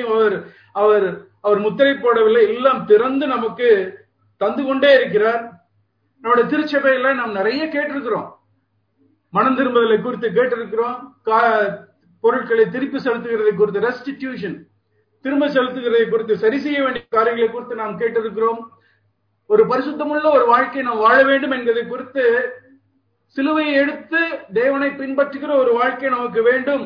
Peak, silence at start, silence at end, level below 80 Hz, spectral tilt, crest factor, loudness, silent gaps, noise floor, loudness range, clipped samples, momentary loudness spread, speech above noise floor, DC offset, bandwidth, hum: -2 dBFS; 0 s; 0 s; -64 dBFS; -7.5 dB/octave; 16 dB; -18 LUFS; none; -66 dBFS; 4 LU; under 0.1%; 11 LU; 48 dB; under 0.1%; 5.4 kHz; none